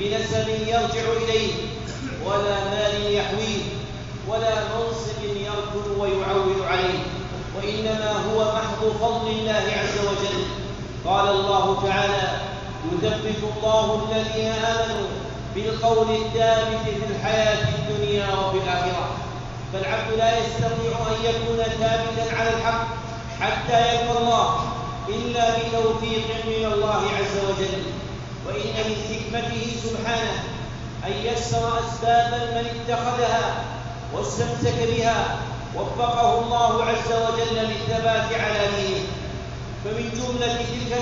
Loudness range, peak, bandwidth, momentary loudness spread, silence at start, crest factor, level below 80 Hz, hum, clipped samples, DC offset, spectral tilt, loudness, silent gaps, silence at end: 3 LU; -8 dBFS; 7.6 kHz; 10 LU; 0 s; 16 dB; -40 dBFS; none; under 0.1%; 0.1%; -3.5 dB/octave; -23 LUFS; none; 0 s